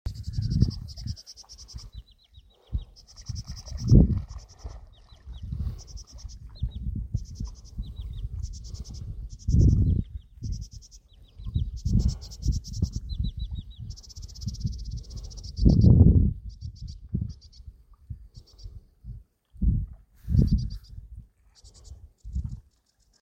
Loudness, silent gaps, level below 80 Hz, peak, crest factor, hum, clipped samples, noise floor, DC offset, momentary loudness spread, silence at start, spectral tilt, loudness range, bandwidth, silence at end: -27 LUFS; none; -32 dBFS; -2 dBFS; 24 dB; none; under 0.1%; -66 dBFS; under 0.1%; 25 LU; 0.05 s; -8 dB/octave; 13 LU; 8.2 kHz; 0.6 s